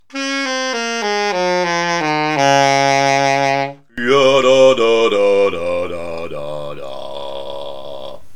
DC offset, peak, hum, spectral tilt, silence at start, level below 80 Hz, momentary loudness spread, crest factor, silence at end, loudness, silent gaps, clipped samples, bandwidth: 2%; 0 dBFS; none; -3.5 dB/octave; 0 s; -56 dBFS; 17 LU; 16 dB; 0 s; -15 LUFS; none; under 0.1%; 12.5 kHz